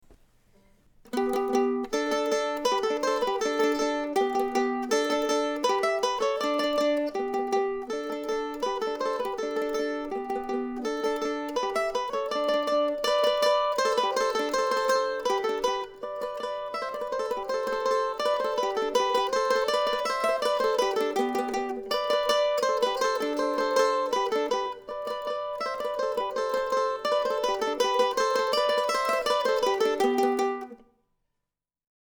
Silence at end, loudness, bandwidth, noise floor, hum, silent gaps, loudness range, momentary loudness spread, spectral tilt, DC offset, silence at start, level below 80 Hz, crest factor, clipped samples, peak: 1.3 s; -27 LUFS; over 20 kHz; -86 dBFS; none; none; 4 LU; 7 LU; -2 dB/octave; under 0.1%; 0.1 s; -60 dBFS; 16 dB; under 0.1%; -12 dBFS